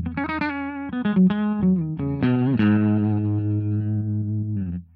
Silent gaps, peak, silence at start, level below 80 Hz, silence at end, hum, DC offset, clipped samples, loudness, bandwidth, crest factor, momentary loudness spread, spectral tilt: none; -8 dBFS; 0 s; -52 dBFS; 0.1 s; none; under 0.1%; under 0.1%; -23 LUFS; 4.8 kHz; 12 dB; 8 LU; -11 dB/octave